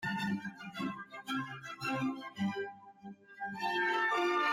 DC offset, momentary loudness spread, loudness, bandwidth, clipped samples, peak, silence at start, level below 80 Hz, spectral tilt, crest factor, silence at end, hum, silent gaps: under 0.1%; 14 LU; -36 LUFS; 16 kHz; under 0.1%; -22 dBFS; 0 s; -76 dBFS; -5 dB/octave; 14 dB; 0 s; none; none